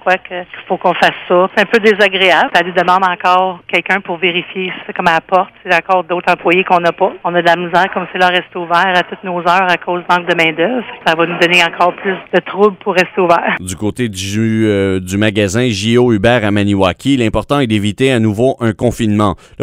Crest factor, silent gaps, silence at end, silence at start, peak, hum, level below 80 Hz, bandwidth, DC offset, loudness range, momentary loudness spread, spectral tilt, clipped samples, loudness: 12 dB; none; 0 s; 0.05 s; 0 dBFS; none; -44 dBFS; 16 kHz; under 0.1%; 2 LU; 6 LU; -5 dB/octave; 0.2%; -13 LUFS